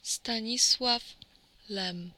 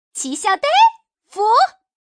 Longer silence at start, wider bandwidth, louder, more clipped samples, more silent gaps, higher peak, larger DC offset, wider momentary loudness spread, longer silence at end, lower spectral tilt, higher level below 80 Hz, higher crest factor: about the same, 0.05 s vs 0.15 s; first, 17.5 kHz vs 10.5 kHz; second, -27 LUFS vs -16 LUFS; neither; neither; second, -12 dBFS vs -4 dBFS; neither; first, 14 LU vs 10 LU; second, 0.05 s vs 0.4 s; first, -1 dB/octave vs 1 dB/octave; first, -64 dBFS vs -70 dBFS; first, 20 dB vs 14 dB